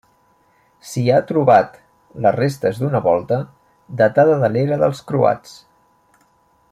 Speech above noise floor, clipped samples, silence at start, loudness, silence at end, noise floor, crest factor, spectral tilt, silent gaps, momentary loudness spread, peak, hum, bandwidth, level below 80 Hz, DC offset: 42 dB; under 0.1%; 0.85 s; -17 LUFS; 1.2 s; -58 dBFS; 16 dB; -7 dB/octave; none; 12 LU; -2 dBFS; none; 15 kHz; -58 dBFS; under 0.1%